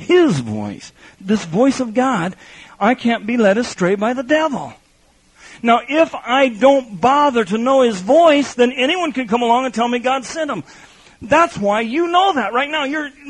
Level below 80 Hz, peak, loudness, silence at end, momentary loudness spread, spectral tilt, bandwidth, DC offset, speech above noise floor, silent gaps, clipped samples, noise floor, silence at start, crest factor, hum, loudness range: -54 dBFS; 0 dBFS; -16 LUFS; 0 s; 9 LU; -5 dB/octave; 11 kHz; under 0.1%; 38 dB; none; under 0.1%; -54 dBFS; 0 s; 16 dB; none; 4 LU